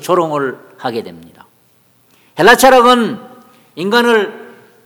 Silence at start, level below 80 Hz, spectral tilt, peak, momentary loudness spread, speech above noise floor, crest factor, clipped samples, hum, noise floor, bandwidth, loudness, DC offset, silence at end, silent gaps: 0 s; -48 dBFS; -3.5 dB/octave; 0 dBFS; 18 LU; 41 dB; 14 dB; 0.6%; none; -53 dBFS; 19.5 kHz; -11 LUFS; under 0.1%; 0.4 s; none